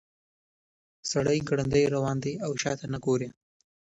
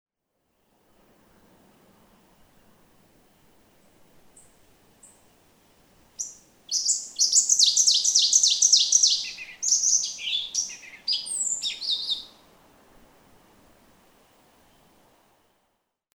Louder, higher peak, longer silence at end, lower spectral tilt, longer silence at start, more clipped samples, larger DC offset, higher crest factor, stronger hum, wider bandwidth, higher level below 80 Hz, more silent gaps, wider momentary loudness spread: second, -28 LUFS vs -20 LUFS; second, -10 dBFS vs -4 dBFS; second, 0.55 s vs 3.85 s; first, -5.5 dB/octave vs 4 dB/octave; second, 1.05 s vs 6.2 s; neither; neither; second, 18 dB vs 24 dB; neither; second, 8.2 kHz vs over 20 kHz; first, -56 dBFS vs -70 dBFS; neither; second, 7 LU vs 16 LU